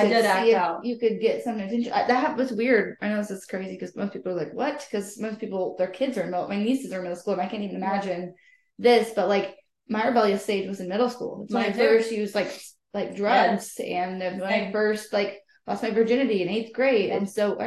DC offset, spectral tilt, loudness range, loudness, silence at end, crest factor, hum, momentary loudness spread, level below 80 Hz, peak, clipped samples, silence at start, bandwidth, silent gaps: under 0.1%; -5 dB/octave; 4 LU; -25 LUFS; 0 s; 18 dB; none; 12 LU; -72 dBFS; -8 dBFS; under 0.1%; 0 s; 12.5 kHz; none